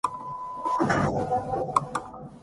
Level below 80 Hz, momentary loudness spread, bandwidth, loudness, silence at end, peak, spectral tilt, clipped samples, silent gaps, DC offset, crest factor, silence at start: -52 dBFS; 11 LU; 11.5 kHz; -28 LUFS; 0 s; -4 dBFS; -6 dB/octave; under 0.1%; none; under 0.1%; 22 dB; 0.05 s